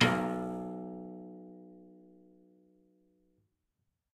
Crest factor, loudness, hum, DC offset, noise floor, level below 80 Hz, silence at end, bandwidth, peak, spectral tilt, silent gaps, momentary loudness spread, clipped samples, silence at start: 26 dB; -37 LUFS; none; under 0.1%; -83 dBFS; -72 dBFS; 2.1 s; 14.5 kHz; -12 dBFS; -5 dB/octave; none; 24 LU; under 0.1%; 0 s